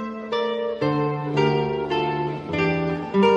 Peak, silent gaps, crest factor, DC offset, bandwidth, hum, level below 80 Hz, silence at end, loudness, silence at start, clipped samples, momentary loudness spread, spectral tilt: -8 dBFS; none; 16 dB; under 0.1%; 8.4 kHz; none; -52 dBFS; 0 s; -23 LUFS; 0 s; under 0.1%; 5 LU; -7.5 dB/octave